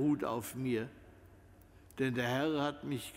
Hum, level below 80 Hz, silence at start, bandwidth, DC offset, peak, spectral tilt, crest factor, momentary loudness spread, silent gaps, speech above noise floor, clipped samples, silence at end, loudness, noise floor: none; -66 dBFS; 0 s; 16 kHz; under 0.1%; -20 dBFS; -5.5 dB/octave; 18 dB; 8 LU; none; 24 dB; under 0.1%; 0 s; -36 LUFS; -59 dBFS